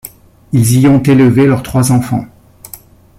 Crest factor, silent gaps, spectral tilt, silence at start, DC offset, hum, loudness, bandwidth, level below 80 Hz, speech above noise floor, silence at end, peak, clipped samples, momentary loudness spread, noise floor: 10 dB; none; -6.5 dB/octave; 0.05 s; under 0.1%; none; -10 LUFS; 16 kHz; -40 dBFS; 28 dB; 0.45 s; -2 dBFS; under 0.1%; 24 LU; -36 dBFS